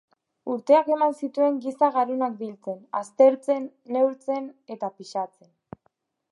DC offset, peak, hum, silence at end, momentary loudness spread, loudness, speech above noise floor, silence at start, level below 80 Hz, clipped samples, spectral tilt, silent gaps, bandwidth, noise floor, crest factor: under 0.1%; -6 dBFS; none; 1.05 s; 15 LU; -24 LUFS; 47 dB; 0.45 s; -76 dBFS; under 0.1%; -6 dB/octave; none; 11 kHz; -71 dBFS; 20 dB